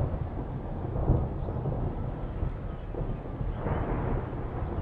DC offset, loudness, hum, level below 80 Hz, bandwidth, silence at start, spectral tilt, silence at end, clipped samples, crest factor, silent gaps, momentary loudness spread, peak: under 0.1%; -33 LUFS; none; -36 dBFS; 4.1 kHz; 0 s; -11 dB/octave; 0 s; under 0.1%; 18 dB; none; 7 LU; -12 dBFS